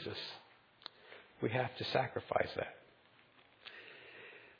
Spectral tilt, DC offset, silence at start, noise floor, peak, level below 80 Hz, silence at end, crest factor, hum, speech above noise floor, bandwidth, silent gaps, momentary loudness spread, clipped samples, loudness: -3.5 dB/octave; under 0.1%; 0 s; -66 dBFS; -18 dBFS; -74 dBFS; 0.05 s; 24 dB; none; 28 dB; 5.2 kHz; none; 19 LU; under 0.1%; -39 LUFS